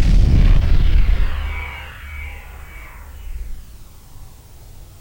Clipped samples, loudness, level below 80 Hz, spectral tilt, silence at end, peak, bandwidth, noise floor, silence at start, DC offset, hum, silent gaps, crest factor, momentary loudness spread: under 0.1%; -20 LUFS; -18 dBFS; -7 dB/octave; 0.15 s; -4 dBFS; 16.5 kHz; -39 dBFS; 0 s; under 0.1%; none; none; 14 dB; 27 LU